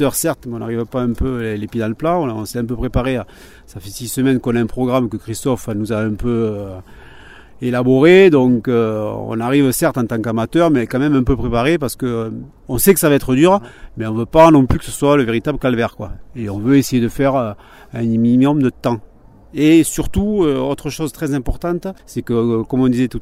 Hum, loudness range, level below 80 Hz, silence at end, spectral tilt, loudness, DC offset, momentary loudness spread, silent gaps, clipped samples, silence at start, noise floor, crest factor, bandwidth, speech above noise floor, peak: none; 6 LU; -34 dBFS; 0 s; -6 dB/octave; -16 LUFS; under 0.1%; 13 LU; none; under 0.1%; 0 s; -39 dBFS; 16 dB; 16 kHz; 23 dB; 0 dBFS